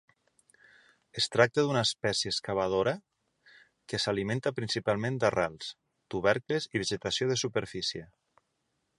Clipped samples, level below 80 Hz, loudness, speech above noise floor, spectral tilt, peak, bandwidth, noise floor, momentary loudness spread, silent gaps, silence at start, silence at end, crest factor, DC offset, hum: under 0.1%; -62 dBFS; -30 LUFS; 49 dB; -4 dB/octave; -6 dBFS; 11.5 kHz; -79 dBFS; 10 LU; none; 1.15 s; 0.95 s; 26 dB; under 0.1%; none